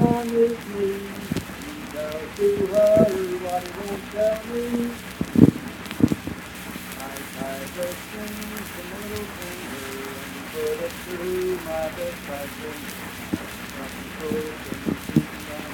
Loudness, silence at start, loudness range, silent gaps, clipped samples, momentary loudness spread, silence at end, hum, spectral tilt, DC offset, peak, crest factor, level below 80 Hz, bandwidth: -26 LUFS; 0 s; 9 LU; none; under 0.1%; 14 LU; 0 s; none; -6 dB/octave; under 0.1%; 0 dBFS; 26 dB; -48 dBFS; 19 kHz